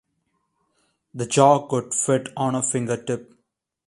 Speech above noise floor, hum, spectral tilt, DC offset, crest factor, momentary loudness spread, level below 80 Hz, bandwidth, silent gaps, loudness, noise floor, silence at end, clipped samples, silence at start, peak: 53 dB; none; -4.5 dB/octave; under 0.1%; 22 dB; 14 LU; -64 dBFS; 11.5 kHz; none; -22 LUFS; -74 dBFS; 0.65 s; under 0.1%; 1.15 s; -2 dBFS